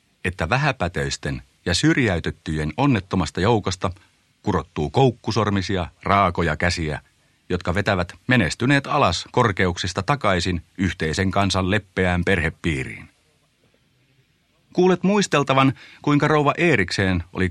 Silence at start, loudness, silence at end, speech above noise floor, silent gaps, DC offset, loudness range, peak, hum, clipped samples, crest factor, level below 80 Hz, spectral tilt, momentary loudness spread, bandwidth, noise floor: 0.25 s; -21 LUFS; 0 s; 42 dB; none; under 0.1%; 3 LU; -2 dBFS; none; under 0.1%; 20 dB; -42 dBFS; -5.5 dB/octave; 9 LU; 12 kHz; -63 dBFS